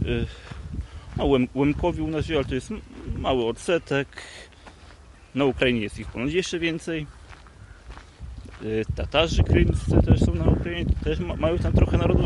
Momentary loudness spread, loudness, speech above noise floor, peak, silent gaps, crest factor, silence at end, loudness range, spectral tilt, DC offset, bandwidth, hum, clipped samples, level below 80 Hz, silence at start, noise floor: 19 LU; -24 LUFS; 25 dB; -4 dBFS; none; 20 dB; 0 s; 6 LU; -6.5 dB/octave; under 0.1%; 11.5 kHz; none; under 0.1%; -32 dBFS; 0 s; -48 dBFS